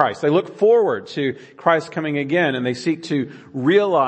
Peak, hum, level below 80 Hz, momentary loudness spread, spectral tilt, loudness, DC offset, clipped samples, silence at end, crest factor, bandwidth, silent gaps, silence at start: 0 dBFS; none; -70 dBFS; 9 LU; -6.5 dB/octave; -20 LUFS; under 0.1%; under 0.1%; 0 s; 18 dB; 8.6 kHz; none; 0 s